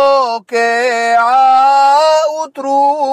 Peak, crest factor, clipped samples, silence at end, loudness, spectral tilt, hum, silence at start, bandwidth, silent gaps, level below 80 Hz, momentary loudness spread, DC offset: -2 dBFS; 8 dB; under 0.1%; 0 s; -11 LUFS; -1 dB/octave; none; 0 s; 13.5 kHz; none; -64 dBFS; 7 LU; under 0.1%